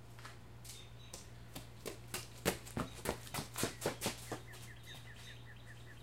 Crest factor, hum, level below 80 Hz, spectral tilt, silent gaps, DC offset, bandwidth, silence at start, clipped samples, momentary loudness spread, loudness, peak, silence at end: 30 dB; none; -60 dBFS; -3.5 dB/octave; none; 0.1%; 16.5 kHz; 0 s; under 0.1%; 14 LU; -45 LUFS; -16 dBFS; 0 s